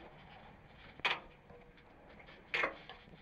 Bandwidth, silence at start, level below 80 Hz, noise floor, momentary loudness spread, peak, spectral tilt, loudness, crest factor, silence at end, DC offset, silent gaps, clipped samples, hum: 13.5 kHz; 0 s; -66 dBFS; -60 dBFS; 23 LU; -20 dBFS; -3.5 dB/octave; -38 LUFS; 26 dB; 0 s; under 0.1%; none; under 0.1%; none